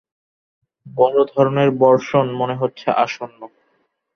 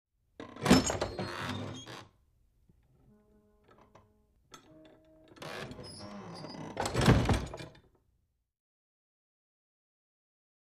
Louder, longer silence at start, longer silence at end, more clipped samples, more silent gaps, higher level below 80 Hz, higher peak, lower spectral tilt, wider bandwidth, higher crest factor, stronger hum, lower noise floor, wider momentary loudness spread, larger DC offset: first, -17 LUFS vs -31 LUFS; first, 0.85 s vs 0.4 s; second, 0.7 s vs 2.9 s; neither; neither; second, -64 dBFS vs -48 dBFS; first, -2 dBFS vs -12 dBFS; first, -7 dB/octave vs -5 dB/octave; second, 6.6 kHz vs 15.5 kHz; second, 18 dB vs 24 dB; neither; second, -66 dBFS vs -76 dBFS; second, 11 LU vs 23 LU; neither